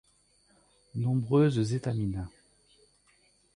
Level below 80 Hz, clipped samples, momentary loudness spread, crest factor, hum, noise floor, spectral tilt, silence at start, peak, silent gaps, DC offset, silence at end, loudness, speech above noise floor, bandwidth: -54 dBFS; under 0.1%; 15 LU; 18 dB; 50 Hz at -50 dBFS; -66 dBFS; -8 dB/octave; 0.95 s; -14 dBFS; none; under 0.1%; 1.25 s; -29 LUFS; 39 dB; 10.5 kHz